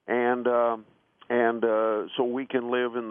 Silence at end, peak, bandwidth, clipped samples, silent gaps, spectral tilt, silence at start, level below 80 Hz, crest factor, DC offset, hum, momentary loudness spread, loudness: 0 s; -10 dBFS; 3.7 kHz; under 0.1%; none; -9 dB/octave; 0.05 s; -78 dBFS; 16 dB; under 0.1%; none; 5 LU; -26 LUFS